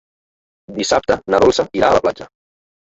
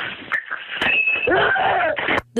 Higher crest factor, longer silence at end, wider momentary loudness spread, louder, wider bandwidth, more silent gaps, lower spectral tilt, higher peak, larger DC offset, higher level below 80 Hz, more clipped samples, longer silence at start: about the same, 16 dB vs 14 dB; first, 0.6 s vs 0 s; first, 12 LU vs 8 LU; first, -16 LUFS vs -19 LUFS; second, 8.2 kHz vs 14.5 kHz; neither; about the same, -4 dB/octave vs -4.5 dB/octave; first, -2 dBFS vs -6 dBFS; neither; first, -44 dBFS vs -50 dBFS; neither; first, 0.7 s vs 0 s